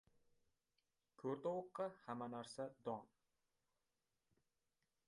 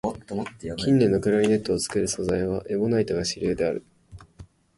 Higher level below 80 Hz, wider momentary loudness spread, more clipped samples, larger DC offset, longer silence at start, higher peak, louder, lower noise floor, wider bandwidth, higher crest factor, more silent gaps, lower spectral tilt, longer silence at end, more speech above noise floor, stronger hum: second, -88 dBFS vs -48 dBFS; second, 6 LU vs 11 LU; neither; neither; first, 1.2 s vs 0.05 s; second, -32 dBFS vs -8 dBFS; second, -49 LUFS vs -25 LUFS; first, -89 dBFS vs -49 dBFS; about the same, 11 kHz vs 11.5 kHz; about the same, 20 dB vs 18 dB; neither; about the same, -6 dB/octave vs -5.5 dB/octave; first, 2 s vs 0.35 s; first, 42 dB vs 26 dB; neither